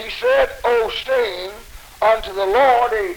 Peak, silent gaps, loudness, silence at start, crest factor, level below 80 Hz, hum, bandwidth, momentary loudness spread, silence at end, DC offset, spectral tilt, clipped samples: -4 dBFS; none; -17 LUFS; 0 s; 14 dB; -42 dBFS; none; over 20 kHz; 8 LU; 0 s; under 0.1%; -3 dB/octave; under 0.1%